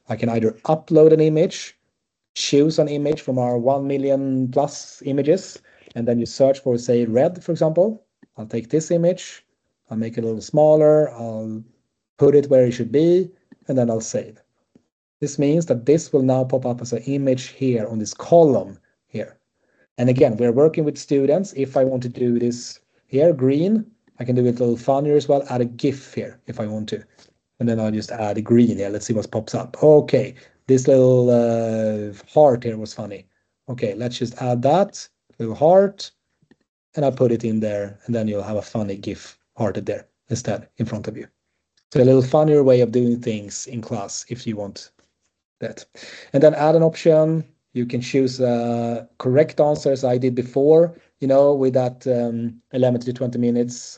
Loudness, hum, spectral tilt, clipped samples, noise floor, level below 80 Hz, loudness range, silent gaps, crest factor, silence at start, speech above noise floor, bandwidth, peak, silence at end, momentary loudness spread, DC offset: -19 LUFS; none; -7 dB/octave; under 0.1%; -75 dBFS; -64 dBFS; 5 LU; 2.29-2.35 s, 12.09-12.17 s, 14.92-15.20 s, 19.91-19.96 s, 36.69-36.93 s, 41.84-41.90 s, 45.45-45.56 s; 18 dB; 0.1 s; 57 dB; 8.6 kHz; -2 dBFS; 0 s; 17 LU; under 0.1%